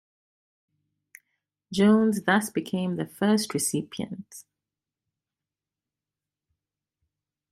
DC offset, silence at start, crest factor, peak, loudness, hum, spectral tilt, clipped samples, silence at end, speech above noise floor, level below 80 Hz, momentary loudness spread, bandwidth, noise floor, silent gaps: under 0.1%; 1.7 s; 22 dB; -8 dBFS; -25 LUFS; none; -5 dB/octave; under 0.1%; 3.1 s; 65 dB; -68 dBFS; 15 LU; 15 kHz; -90 dBFS; none